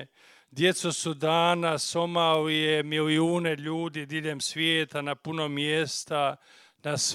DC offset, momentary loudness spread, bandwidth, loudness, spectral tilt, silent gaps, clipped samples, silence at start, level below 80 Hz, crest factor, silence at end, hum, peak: under 0.1%; 8 LU; 14.5 kHz; -27 LUFS; -3.5 dB/octave; none; under 0.1%; 0 s; -74 dBFS; 20 dB; 0 s; none; -8 dBFS